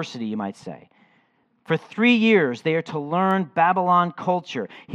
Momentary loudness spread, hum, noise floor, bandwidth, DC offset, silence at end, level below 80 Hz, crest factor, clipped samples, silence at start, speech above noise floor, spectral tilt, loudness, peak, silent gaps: 14 LU; none; -64 dBFS; 8.6 kHz; under 0.1%; 0 s; -76 dBFS; 18 dB; under 0.1%; 0 s; 42 dB; -6.5 dB/octave; -21 LUFS; -6 dBFS; none